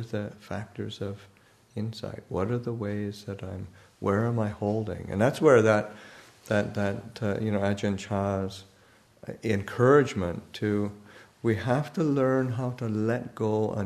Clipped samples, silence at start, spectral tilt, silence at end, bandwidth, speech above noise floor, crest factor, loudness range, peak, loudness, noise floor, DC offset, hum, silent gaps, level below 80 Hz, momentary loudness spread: under 0.1%; 0 s; -7 dB/octave; 0 s; 13.5 kHz; 32 dB; 20 dB; 8 LU; -8 dBFS; -28 LUFS; -59 dBFS; under 0.1%; none; none; -60 dBFS; 17 LU